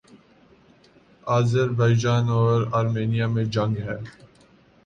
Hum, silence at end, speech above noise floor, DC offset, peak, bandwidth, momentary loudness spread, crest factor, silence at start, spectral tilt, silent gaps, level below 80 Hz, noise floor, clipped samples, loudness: none; 0.75 s; 34 dB; under 0.1%; -8 dBFS; 7.6 kHz; 12 LU; 14 dB; 1.25 s; -7 dB/octave; none; -54 dBFS; -55 dBFS; under 0.1%; -22 LUFS